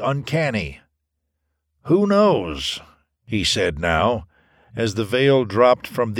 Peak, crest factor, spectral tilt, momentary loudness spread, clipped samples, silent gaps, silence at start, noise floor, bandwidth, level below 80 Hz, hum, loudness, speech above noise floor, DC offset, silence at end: -2 dBFS; 18 dB; -5 dB/octave; 12 LU; under 0.1%; none; 0 s; -76 dBFS; 17 kHz; -44 dBFS; none; -19 LUFS; 57 dB; under 0.1%; 0 s